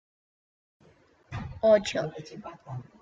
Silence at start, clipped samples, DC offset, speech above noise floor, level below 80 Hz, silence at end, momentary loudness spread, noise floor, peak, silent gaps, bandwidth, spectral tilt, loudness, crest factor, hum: 1.3 s; under 0.1%; under 0.1%; 33 dB; -58 dBFS; 0.2 s; 20 LU; -61 dBFS; -10 dBFS; none; 9 kHz; -5.5 dB/octave; -26 LUFS; 20 dB; none